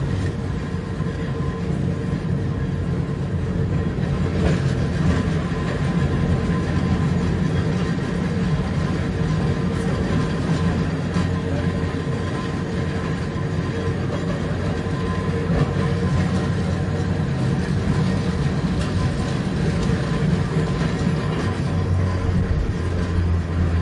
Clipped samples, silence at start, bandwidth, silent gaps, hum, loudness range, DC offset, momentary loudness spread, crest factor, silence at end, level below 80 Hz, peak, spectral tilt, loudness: under 0.1%; 0 s; 11 kHz; none; none; 3 LU; under 0.1%; 4 LU; 14 dB; 0 s; -34 dBFS; -6 dBFS; -7.5 dB/octave; -22 LUFS